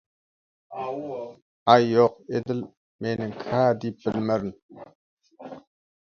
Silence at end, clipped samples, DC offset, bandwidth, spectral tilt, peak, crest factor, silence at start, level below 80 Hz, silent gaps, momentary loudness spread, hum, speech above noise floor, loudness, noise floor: 0.45 s; under 0.1%; under 0.1%; 6.8 kHz; -7 dB/octave; 0 dBFS; 26 dB; 0.7 s; -64 dBFS; 1.42-1.66 s, 2.77-2.99 s, 4.62-4.69 s, 4.95-5.17 s; 23 LU; none; over 66 dB; -25 LUFS; under -90 dBFS